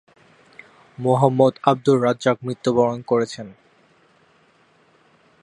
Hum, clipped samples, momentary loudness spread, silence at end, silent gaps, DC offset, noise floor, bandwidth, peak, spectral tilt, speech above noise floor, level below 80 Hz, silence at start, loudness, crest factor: none; under 0.1%; 10 LU; 1.9 s; none; under 0.1%; -58 dBFS; 11 kHz; -2 dBFS; -7 dB/octave; 39 dB; -64 dBFS; 1 s; -19 LUFS; 20 dB